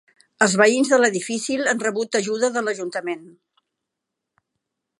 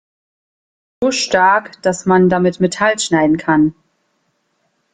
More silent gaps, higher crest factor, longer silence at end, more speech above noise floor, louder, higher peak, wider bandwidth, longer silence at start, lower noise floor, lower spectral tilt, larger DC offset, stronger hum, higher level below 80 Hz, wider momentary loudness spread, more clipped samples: neither; first, 20 dB vs 14 dB; first, 1.7 s vs 1.2 s; first, 62 dB vs 52 dB; second, -20 LUFS vs -14 LUFS; about the same, -2 dBFS vs -2 dBFS; first, 11.5 kHz vs 9.6 kHz; second, 0.4 s vs 1 s; first, -83 dBFS vs -65 dBFS; second, -3 dB/octave vs -5 dB/octave; neither; neither; second, -74 dBFS vs -54 dBFS; first, 12 LU vs 6 LU; neither